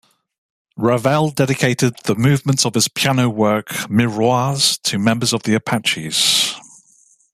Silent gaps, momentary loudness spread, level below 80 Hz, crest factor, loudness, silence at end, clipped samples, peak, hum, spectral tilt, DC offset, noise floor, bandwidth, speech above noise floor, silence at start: none; 4 LU; -56 dBFS; 16 dB; -16 LUFS; 0.75 s; under 0.1%; -2 dBFS; none; -4 dB/octave; under 0.1%; -54 dBFS; 15 kHz; 37 dB; 0.75 s